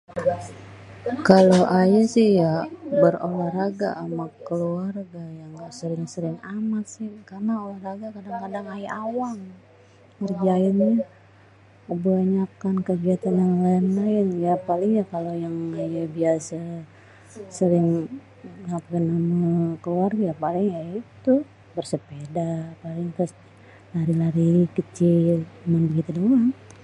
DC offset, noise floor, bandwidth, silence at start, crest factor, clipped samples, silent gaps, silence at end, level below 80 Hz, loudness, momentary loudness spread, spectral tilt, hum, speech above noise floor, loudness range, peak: under 0.1%; -52 dBFS; 11 kHz; 0.15 s; 22 dB; under 0.1%; none; 0.15 s; -62 dBFS; -23 LUFS; 15 LU; -8 dB/octave; none; 30 dB; 11 LU; 0 dBFS